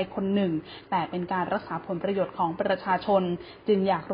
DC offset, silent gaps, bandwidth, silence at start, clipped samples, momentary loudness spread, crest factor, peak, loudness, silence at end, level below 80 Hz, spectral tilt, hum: under 0.1%; none; 5.2 kHz; 0 s; under 0.1%; 7 LU; 16 dB; -10 dBFS; -28 LUFS; 0 s; -60 dBFS; -11 dB/octave; none